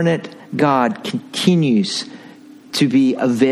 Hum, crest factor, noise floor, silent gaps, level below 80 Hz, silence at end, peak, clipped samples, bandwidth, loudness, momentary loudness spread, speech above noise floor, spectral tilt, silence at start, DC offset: none; 16 dB; -41 dBFS; none; -62 dBFS; 0 s; 0 dBFS; under 0.1%; 13.5 kHz; -17 LUFS; 10 LU; 24 dB; -5.5 dB/octave; 0 s; under 0.1%